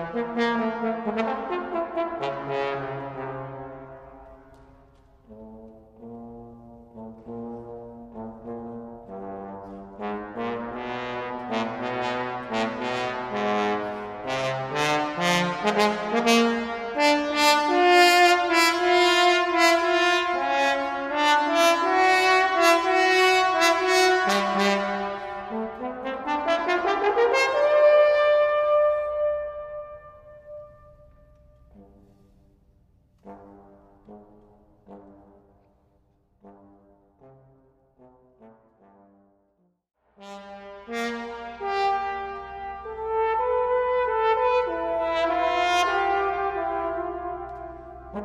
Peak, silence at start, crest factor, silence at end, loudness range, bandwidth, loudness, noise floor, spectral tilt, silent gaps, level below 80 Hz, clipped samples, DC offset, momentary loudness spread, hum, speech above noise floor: -4 dBFS; 0 s; 22 dB; 0 s; 20 LU; 15.5 kHz; -23 LUFS; -68 dBFS; -3.5 dB/octave; none; -56 dBFS; under 0.1%; under 0.1%; 21 LU; none; 41 dB